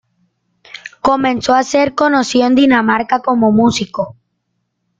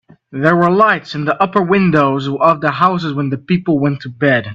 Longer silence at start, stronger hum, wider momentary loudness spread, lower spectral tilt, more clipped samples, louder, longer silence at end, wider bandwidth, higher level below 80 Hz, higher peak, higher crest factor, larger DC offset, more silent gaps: first, 0.85 s vs 0.3 s; neither; first, 12 LU vs 7 LU; second, -4.5 dB/octave vs -8 dB/octave; neither; about the same, -13 LUFS vs -14 LUFS; first, 0.85 s vs 0 s; first, 9 kHz vs 7.4 kHz; about the same, -50 dBFS vs -52 dBFS; about the same, 0 dBFS vs 0 dBFS; about the same, 14 dB vs 14 dB; neither; neither